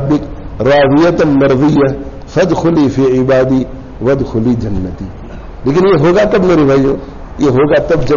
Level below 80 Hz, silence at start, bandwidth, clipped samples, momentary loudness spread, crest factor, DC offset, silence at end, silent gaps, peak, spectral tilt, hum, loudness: -28 dBFS; 0 s; 7.2 kHz; under 0.1%; 14 LU; 8 dB; under 0.1%; 0 s; none; -2 dBFS; -6.5 dB/octave; none; -11 LUFS